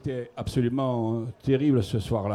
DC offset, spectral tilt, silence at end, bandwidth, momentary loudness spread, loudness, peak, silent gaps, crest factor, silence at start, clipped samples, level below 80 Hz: under 0.1%; -8 dB/octave; 0 s; 13 kHz; 8 LU; -27 LUFS; -12 dBFS; none; 14 dB; 0.05 s; under 0.1%; -48 dBFS